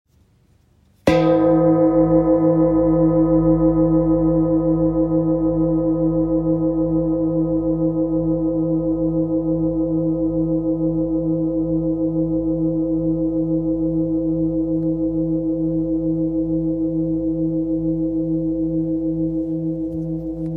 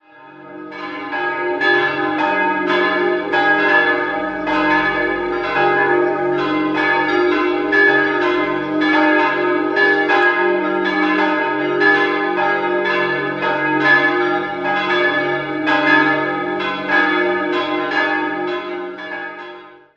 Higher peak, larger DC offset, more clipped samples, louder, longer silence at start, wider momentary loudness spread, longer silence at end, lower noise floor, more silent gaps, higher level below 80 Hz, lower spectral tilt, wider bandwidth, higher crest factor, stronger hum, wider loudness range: about the same, -2 dBFS vs 0 dBFS; neither; neither; second, -19 LUFS vs -16 LUFS; first, 1.05 s vs 0.2 s; second, 6 LU vs 9 LU; second, 0 s vs 0.2 s; first, -56 dBFS vs -40 dBFS; neither; first, -36 dBFS vs -54 dBFS; first, -10.5 dB/octave vs -5.5 dB/octave; second, 5.6 kHz vs 7.6 kHz; about the same, 16 dB vs 16 dB; neither; first, 5 LU vs 2 LU